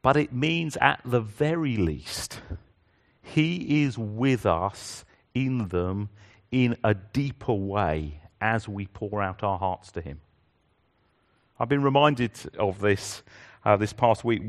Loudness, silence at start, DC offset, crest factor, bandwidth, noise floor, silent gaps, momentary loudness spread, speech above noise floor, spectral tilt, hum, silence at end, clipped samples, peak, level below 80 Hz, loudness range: -26 LUFS; 0.05 s; under 0.1%; 24 dB; 13 kHz; -68 dBFS; none; 15 LU; 42 dB; -6 dB/octave; none; 0 s; under 0.1%; -2 dBFS; -50 dBFS; 4 LU